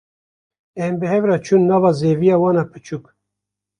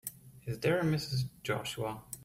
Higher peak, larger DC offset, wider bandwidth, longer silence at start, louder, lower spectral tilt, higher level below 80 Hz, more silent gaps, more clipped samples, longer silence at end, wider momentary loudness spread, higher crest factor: first, -2 dBFS vs -18 dBFS; neither; second, 10 kHz vs 16 kHz; first, 0.75 s vs 0.05 s; first, -17 LUFS vs -34 LUFS; first, -8 dB/octave vs -5.5 dB/octave; about the same, -58 dBFS vs -62 dBFS; neither; neither; first, 0.8 s vs 0 s; first, 17 LU vs 13 LU; about the same, 16 dB vs 16 dB